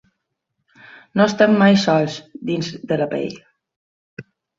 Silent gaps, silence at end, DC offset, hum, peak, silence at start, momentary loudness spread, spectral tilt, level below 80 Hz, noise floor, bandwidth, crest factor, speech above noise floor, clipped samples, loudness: 3.76-4.17 s; 0.35 s; under 0.1%; none; -2 dBFS; 1.15 s; 12 LU; -6 dB/octave; -60 dBFS; -76 dBFS; 7.6 kHz; 18 dB; 58 dB; under 0.1%; -18 LUFS